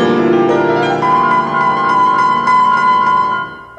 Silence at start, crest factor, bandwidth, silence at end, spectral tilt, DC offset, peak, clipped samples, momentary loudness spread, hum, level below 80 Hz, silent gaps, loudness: 0 s; 10 dB; 9.2 kHz; 0.05 s; -6 dB/octave; under 0.1%; -2 dBFS; under 0.1%; 3 LU; none; -48 dBFS; none; -12 LUFS